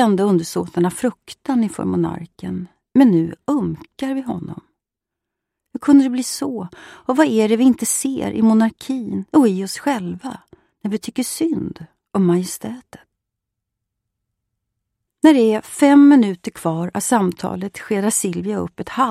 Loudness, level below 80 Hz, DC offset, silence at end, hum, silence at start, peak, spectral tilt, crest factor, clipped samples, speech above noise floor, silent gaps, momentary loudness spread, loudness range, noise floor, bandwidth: -18 LUFS; -56 dBFS; under 0.1%; 0 s; none; 0 s; -2 dBFS; -5.5 dB/octave; 16 dB; under 0.1%; 66 dB; none; 16 LU; 8 LU; -84 dBFS; 15 kHz